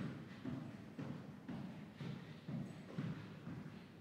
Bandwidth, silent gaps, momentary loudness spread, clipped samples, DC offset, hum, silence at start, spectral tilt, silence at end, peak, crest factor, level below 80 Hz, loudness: 15.5 kHz; none; 4 LU; under 0.1%; under 0.1%; none; 0 s; -7.5 dB/octave; 0 s; -32 dBFS; 16 dB; -76 dBFS; -50 LUFS